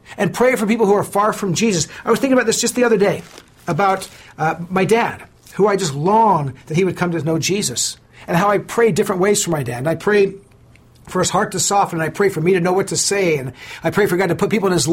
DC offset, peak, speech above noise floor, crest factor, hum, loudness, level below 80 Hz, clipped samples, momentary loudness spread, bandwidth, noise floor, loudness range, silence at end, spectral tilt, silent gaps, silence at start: under 0.1%; -4 dBFS; 30 dB; 14 dB; none; -17 LUFS; -50 dBFS; under 0.1%; 7 LU; 16.5 kHz; -47 dBFS; 1 LU; 0 s; -4.5 dB/octave; none; 0.1 s